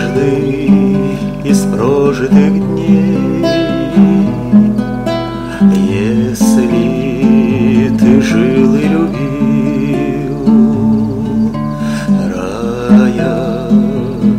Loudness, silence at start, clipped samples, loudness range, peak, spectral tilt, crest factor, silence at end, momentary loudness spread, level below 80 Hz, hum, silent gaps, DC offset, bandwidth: -11 LUFS; 0 s; 0.2%; 2 LU; 0 dBFS; -7.5 dB/octave; 10 dB; 0 s; 7 LU; -34 dBFS; none; none; under 0.1%; 14.5 kHz